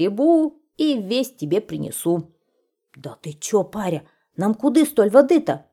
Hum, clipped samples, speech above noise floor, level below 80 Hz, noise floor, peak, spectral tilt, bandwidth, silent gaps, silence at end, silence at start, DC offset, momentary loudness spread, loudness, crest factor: none; under 0.1%; 51 dB; -64 dBFS; -71 dBFS; -2 dBFS; -5.5 dB/octave; 15.5 kHz; none; 0.15 s; 0 s; under 0.1%; 17 LU; -20 LUFS; 18 dB